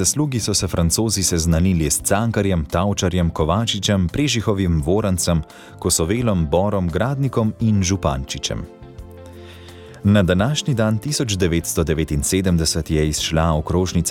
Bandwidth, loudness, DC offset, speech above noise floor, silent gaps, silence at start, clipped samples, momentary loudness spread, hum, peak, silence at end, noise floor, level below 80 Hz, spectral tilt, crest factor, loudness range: 17.5 kHz; -19 LUFS; under 0.1%; 20 dB; none; 0 s; under 0.1%; 8 LU; none; -4 dBFS; 0 s; -39 dBFS; -32 dBFS; -4.5 dB/octave; 16 dB; 3 LU